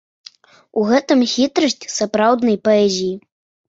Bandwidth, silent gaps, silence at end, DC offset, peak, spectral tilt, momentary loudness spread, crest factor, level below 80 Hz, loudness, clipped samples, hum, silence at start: 8 kHz; none; 0.5 s; under 0.1%; -2 dBFS; -4 dB/octave; 8 LU; 16 dB; -60 dBFS; -17 LUFS; under 0.1%; none; 0.75 s